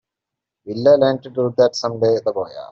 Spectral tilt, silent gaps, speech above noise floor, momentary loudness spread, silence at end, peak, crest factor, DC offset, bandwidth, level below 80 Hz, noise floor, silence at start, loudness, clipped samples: -5 dB/octave; none; 67 dB; 10 LU; 0.05 s; -2 dBFS; 16 dB; under 0.1%; 7.4 kHz; -62 dBFS; -84 dBFS; 0.65 s; -18 LUFS; under 0.1%